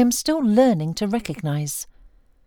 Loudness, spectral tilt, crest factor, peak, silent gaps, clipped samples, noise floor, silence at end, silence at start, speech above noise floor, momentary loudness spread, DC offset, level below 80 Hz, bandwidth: -21 LUFS; -5.5 dB/octave; 16 dB; -6 dBFS; none; under 0.1%; -51 dBFS; 0.65 s; 0 s; 31 dB; 12 LU; under 0.1%; -50 dBFS; 20 kHz